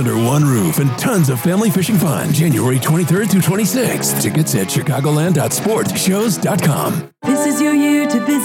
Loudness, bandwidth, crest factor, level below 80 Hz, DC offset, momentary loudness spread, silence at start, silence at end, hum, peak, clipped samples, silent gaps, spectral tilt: -15 LUFS; 17 kHz; 10 dB; -56 dBFS; under 0.1%; 3 LU; 0 s; 0 s; none; -4 dBFS; under 0.1%; none; -5.5 dB/octave